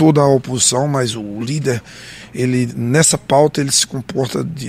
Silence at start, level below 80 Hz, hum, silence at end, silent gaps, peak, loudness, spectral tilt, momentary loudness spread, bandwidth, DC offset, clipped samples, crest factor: 0 s; -50 dBFS; none; 0 s; none; 0 dBFS; -15 LUFS; -4 dB/octave; 11 LU; 16 kHz; under 0.1%; under 0.1%; 16 dB